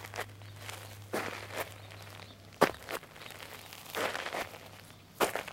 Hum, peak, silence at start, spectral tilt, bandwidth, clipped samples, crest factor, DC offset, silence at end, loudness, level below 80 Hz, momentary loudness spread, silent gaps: none; -6 dBFS; 0 s; -3.5 dB/octave; 16.5 kHz; under 0.1%; 32 dB; under 0.1%; 0 s; -37 LUFS; -66 dBFS; 18 LU; none